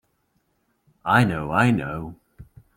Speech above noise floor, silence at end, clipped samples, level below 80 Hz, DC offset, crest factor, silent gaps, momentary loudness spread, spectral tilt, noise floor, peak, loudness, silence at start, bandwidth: 49 dB; 0.35 s; under 0.1%; -50 dBFS; under 0.1%; 20 dB; none; 15 LU; -7 dB/octave; -70 dBFS; -4 dBFS; -22 LUFS; 1.05 s; 16 kHz